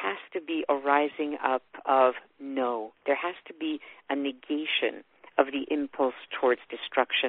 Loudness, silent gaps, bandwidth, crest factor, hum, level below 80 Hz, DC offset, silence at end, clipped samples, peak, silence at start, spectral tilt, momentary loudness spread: -29 LUFS; none; 4.4 kHz; 22 dB; none; -74 dBFS; under 0.1%; 0 s; under 0.1%; -6 dBFS; 0 s; 0.5 dB/octave; 10 LU